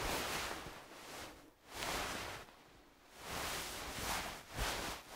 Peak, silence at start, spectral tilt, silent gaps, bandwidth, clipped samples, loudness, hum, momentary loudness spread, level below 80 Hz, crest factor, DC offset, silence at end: -22 dBFS; 0 s; -2 dB/octave; none; 16 kHz; under 0.1%; -43 LUFS; none; 19 LU; -56 dBFS; 22 dB; under 0.1%; 0 s